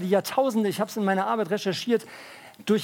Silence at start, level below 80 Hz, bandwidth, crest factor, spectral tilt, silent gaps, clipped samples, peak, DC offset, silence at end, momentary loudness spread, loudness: 0 s; -76 dBFS; 18 kHz; 16 dB; -5 dB/octave; none; under 0.1%; -8 dBFS; under 0.1%; 0 s; 16 LU; -26 LUFS